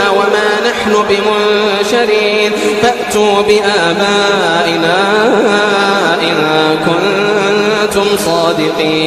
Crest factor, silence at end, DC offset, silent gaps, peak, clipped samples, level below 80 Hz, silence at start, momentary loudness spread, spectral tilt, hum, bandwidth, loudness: 10 dB; 0 s; under 0.1%; none; 0 dBFS; under 0.1%; -46 dBFS; 0 s; 2 LU; -3.5 dB/octave; none; 15 kHz; -10 LUFS